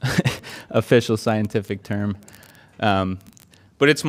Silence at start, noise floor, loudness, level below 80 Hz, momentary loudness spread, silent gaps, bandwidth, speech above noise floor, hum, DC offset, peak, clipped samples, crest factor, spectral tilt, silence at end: 0 s; -52 dBFS; -22 LUFS; -54 dBFS; 10 LU; none; 16 kHz; 31 dB; none; under 0.1%; -2 dBFS; under 0.1%; 20 dB; -5.5 dB/octave; 0 s